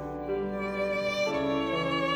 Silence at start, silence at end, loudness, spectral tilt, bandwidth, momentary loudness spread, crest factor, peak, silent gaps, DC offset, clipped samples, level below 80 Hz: 0 s; 0 s; -30 LUFS; -5.5 dB/octave; over 20 kHz; 4 LU; 12 dB; -16 dBFS; none; under 0.1%; under 0.1%; -52 dBFS